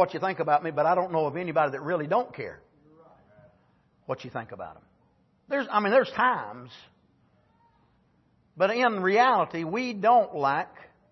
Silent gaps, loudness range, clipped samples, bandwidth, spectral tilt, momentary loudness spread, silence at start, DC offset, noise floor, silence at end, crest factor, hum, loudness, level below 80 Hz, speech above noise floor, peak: none; 10 LU; under 0.1%; 6.2 kHz; -6 dB/octave; 18 LU; 0 s; under 0.1%; -66 dBFS; 0.25 s; 20 dB; none; -26 LUFS; -72 dBFS; 40 dB; -8 dBFS